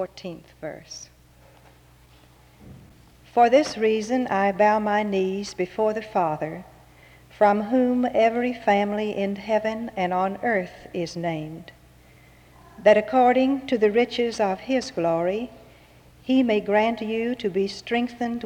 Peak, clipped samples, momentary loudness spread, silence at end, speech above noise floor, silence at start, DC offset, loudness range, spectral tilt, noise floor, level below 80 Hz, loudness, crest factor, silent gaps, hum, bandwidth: -6 dBFS; under 0.1%; 15 LU; 0 s; 30 dB; 0 s; under 0.1%; 5 LU; -5.5 dB/octave; -53 dBFS; -58 dBFS; -23 LUFS; 18 dB; none; none; 15 kHz